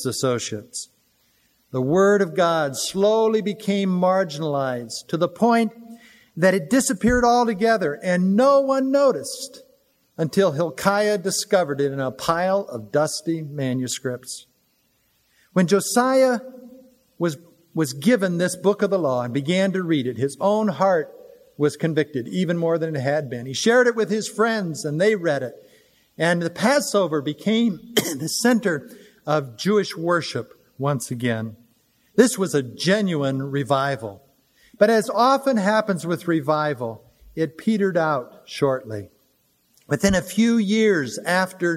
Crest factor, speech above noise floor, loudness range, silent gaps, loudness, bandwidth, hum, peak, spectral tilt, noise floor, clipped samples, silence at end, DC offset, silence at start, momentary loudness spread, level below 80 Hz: 20 dB; 45 dB; 4 LU; none; -21 LUFS; 16 kHz; none; 0 dBFS; -5 dB/octave; -65 dBFS; under 0.1%; 0 s; under 0.1%; 0 s; 10 LU; -52 dBFS